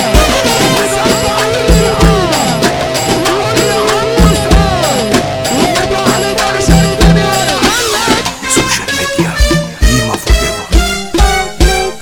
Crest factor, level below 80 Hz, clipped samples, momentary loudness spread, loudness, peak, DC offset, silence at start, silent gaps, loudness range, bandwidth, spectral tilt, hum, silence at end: 10 dB; -16 dBFS; 0.3%; 3 LU; -10 LUFS; 0 dBFS; under 0.1%; 0 s; none; 2 LU; 19.5 kHz; -4 dB/octave; none; 0 s